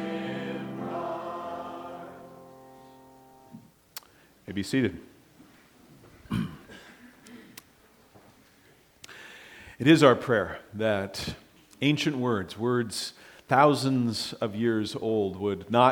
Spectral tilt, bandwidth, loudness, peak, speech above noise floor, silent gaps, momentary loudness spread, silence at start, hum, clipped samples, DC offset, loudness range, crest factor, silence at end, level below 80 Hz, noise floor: -5.5 dB/octave; 20 kHz; -27 LUFS; -4 dBFS; 34 dB; none; 25 LU; 0 s; none; under 0.1%; under 0.1%; 16 LU; 26 dB; 0 s; -62 dBFS; -59 dBFS